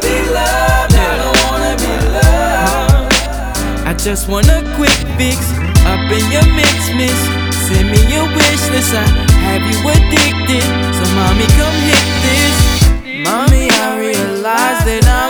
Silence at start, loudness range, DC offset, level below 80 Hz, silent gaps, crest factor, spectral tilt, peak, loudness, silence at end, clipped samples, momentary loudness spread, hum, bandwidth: 0 s; 2 LU; under 0.1%; -16 dBFS; none; 10 dB; -4 dB/octave; 0 dBFS; -11 LUFS; 0 s; 0.3%; 5 LU; none; over 20 kHz